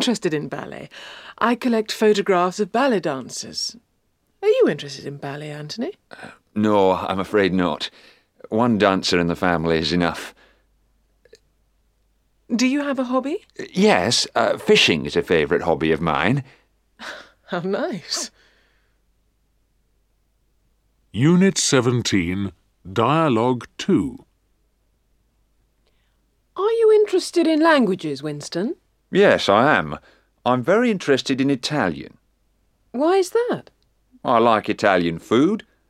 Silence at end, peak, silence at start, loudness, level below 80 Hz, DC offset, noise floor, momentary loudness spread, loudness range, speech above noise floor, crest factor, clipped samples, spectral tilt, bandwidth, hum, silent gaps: 0.3 s; 0 dBFS; 0 s; -20 LUFS; -54 dBFS; under 0.1%; -67 dBFS; 16 LU; 8 LU; 47 dB; 20 dB; under 0.1%; -4.5 dB/octave; 15 kHz; none; none